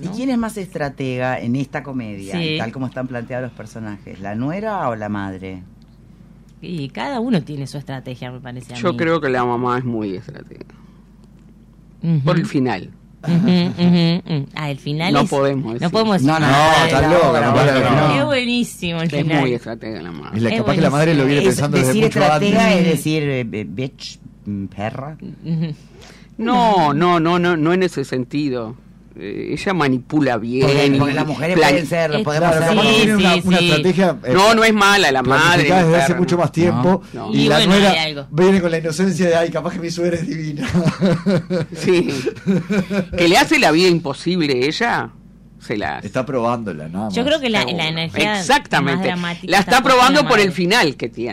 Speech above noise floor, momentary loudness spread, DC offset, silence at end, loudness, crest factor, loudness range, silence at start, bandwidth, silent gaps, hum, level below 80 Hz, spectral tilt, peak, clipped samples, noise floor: 28 dB; 15 LU; under 0.1%; 0 s; -16 LUFS; 12 dB; 11 LU; 0 s; 16 kHz; none; none; -44 dBFS; -5.5 dB/octave; -6 dBFS; under 0.1%; -45 dBFS